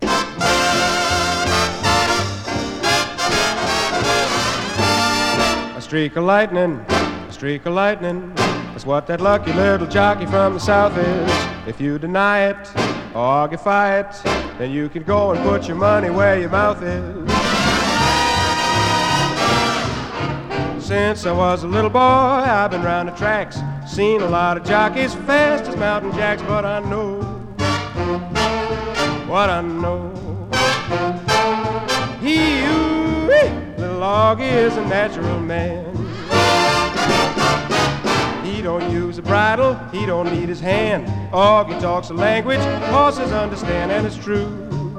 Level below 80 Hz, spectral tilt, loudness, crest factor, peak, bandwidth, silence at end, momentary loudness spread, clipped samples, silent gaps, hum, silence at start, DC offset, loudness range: -38 dBFS; -4.5 dB/octave; -18 LUFS; 18 dB; 0 dBFS; 17.5 kHz; 0 s; 8 LU; under 0.1%; none; none; 0 s; under 0.1%; 3 LU